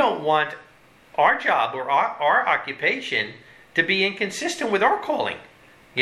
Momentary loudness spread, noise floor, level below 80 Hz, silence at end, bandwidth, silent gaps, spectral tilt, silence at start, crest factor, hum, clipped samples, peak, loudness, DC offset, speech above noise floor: 9 LU; -51 dBFS; -68 dBFS; 0 s; 13.5 kHz; none; -3 dB/octave; 0 s; 20 dB; none; under 0.1%; -4 dBFS; -22 LUFS; under 0.1%; 29 dB